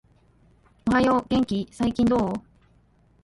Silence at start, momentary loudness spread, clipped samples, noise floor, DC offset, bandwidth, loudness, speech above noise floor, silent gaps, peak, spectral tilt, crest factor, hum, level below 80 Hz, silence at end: 0.85 s; 9 LU; under 0.1%; -60 dBFS; under 0.1%; 11.5 kHz; -24 LUFS; 37 dB; none; -8 dBFS; -6.5 dB/octave; 16 dB; none; -48 dBFS; 0.85 s